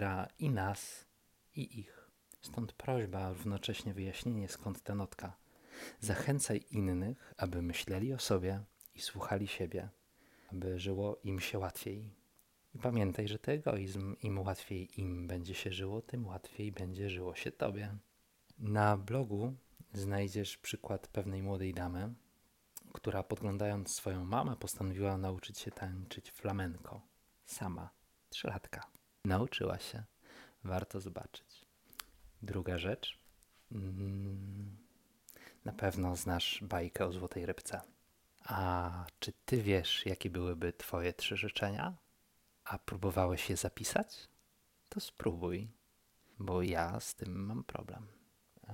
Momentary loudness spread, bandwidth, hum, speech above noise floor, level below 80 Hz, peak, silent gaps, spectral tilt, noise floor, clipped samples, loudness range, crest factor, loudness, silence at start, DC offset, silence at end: 15 LU; 16.5 kHz; none; 34 dB; -62 dBFS; -16 dBFS; none; -5 dB/octave; -73 dBFS; under 0.1%; 6 LU; 24 dB; -39 LUFS; 0 s; under 0.1%; 0 s